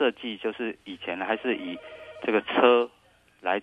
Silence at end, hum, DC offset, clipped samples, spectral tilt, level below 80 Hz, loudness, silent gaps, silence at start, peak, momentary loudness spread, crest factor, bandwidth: 0 s; 60 Hz at -70 dBFS; under 0.1%; under 0.1%; -6 dB/octave; -70 dBFS; -27 LUFS; none; 0 s; -6 dBFS; 16 LU; 22 dB; 4.9 kHz